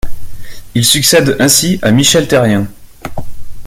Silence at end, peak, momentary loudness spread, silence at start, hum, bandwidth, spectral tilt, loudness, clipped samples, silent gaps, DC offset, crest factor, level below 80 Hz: 0 s; 0 dBFS; 19 LU; 0.05 s; none; over 20 kHz; -3.5 dB/octave; -9 LUFS; 0.1%; none; under 0.1%; 12 dB; -30 dBFS